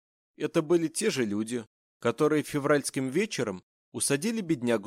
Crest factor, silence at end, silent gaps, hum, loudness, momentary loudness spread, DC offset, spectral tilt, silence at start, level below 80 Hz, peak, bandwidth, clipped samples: 16 dB; 0 s; 1.67-2.00 s, 3.63-3.92 s; none; -28 LUFS; 9 LU; under 0.1%; -4.5 dB/octave; 0.4 s; -70 dBFS; -12 dBFS; 16 kHz; under 0.1%